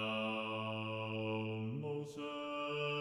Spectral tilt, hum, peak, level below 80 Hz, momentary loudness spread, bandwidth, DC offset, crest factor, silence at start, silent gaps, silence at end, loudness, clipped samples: -6.5 dB/octave; none; -28 dBFS; -80 dBFS; 5 LU; 12 kHz; under 0.1%; 12 dB; 0 s; none; 0 s; -40 LUFS; under 0.1%